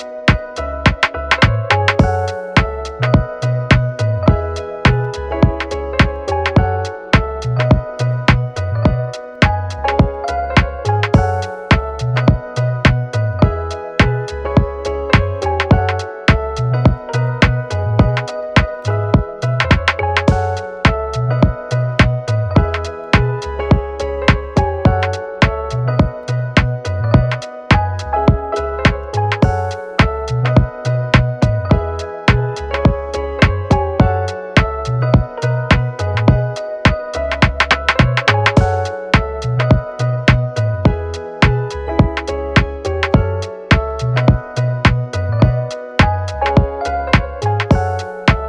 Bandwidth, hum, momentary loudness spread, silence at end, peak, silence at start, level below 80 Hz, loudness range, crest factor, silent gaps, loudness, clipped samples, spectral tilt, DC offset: 9.8 kHz; none; 6 LU; 0 s; 0 dBFS; 0 s; -24 dBFS; 2 LU; 14 dB; none; -16 LUFS; under 0.1%; -6.5 dB/octave; under 0.1%